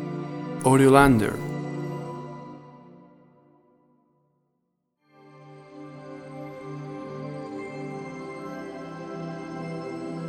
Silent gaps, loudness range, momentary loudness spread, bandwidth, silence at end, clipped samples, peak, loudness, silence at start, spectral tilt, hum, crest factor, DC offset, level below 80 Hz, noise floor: none; 24 LU; 24 LU; 16.5 kHz; 0 s; under 0.1%; -2 dBFS; -26 LUFS; 0 s; -6.5 dB/octave; none; 26 dB; under 0.1%; -50 dBFS; -76 dBFS